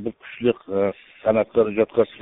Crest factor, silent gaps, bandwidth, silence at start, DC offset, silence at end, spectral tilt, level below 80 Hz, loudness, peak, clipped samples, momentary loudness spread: 18 dB; none; 4 kHz; 0 s; under 0.1%; 0.05 s; -5.5 dB/octave; -56 dBFS; -22 LUFS; -4 dBFS; under 0.1%; 6 LU